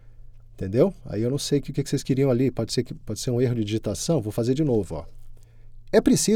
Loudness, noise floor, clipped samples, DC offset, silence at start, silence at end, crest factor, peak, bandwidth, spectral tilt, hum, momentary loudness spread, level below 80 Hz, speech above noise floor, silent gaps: -24 LUFS; -43 dBFS; under 0.1%; under 0.1%; 0.05 s; 0 s; 18 dB; -6 dBFS; 17 kHz; -5.5 dB/octave; none; 7 LU; -44 dBFS; 20 dB; none